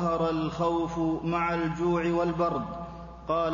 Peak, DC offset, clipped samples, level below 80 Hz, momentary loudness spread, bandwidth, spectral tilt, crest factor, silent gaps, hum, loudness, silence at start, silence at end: -16 dBFS; under 0.1%; under 0.1%; -48 dBFS; 11 LU; 7.4 kHz; -7.5 dB/octave; 12 dB; none; none; -28 LUFS; 0 s; 0 s